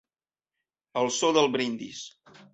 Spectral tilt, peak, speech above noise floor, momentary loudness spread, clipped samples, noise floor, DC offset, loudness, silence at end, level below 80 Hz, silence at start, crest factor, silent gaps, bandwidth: -3 dB/octave; -8 dBFS; over 64 dB; 17 LU; under 0.1%; under -90 dBFS; under 0.1%; -26 LUFS; 0.45 s; -72 dBFS; 0.95 s; 22 dB; none; 8.2 kHz